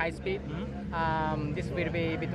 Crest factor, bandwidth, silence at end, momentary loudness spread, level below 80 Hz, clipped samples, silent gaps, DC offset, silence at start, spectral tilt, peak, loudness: 16 dB; 11 kHz; 0 s; 6 LU; -46 dBFS; under 0.1%; none; under 0.1%; 0 s; -7.5 dB/octave; -14 dBFS; -32 LUFS